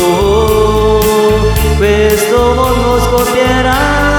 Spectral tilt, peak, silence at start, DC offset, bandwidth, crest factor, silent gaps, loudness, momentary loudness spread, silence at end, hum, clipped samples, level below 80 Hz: -5 dB/octave; 0 dBFS; 0 s; under 0.1%; over 20 kHz; 10 dB; none; -10 LUFS; 2 LU; 0 s; none; under 0.1%; -18 dBFS